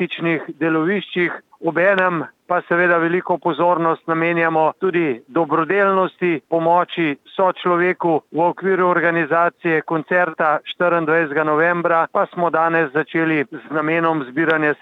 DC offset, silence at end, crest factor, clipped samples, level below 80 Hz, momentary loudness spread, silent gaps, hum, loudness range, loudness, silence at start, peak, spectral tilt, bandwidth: under 0.1%; 0.1 s; 14 dB; under 0.1%; -76 dBFS; 5 LU; none; none; 1 LU; -18 LUFS; 0 s; -4 dBFS; -8.5 dB/octave; 4.7 kHz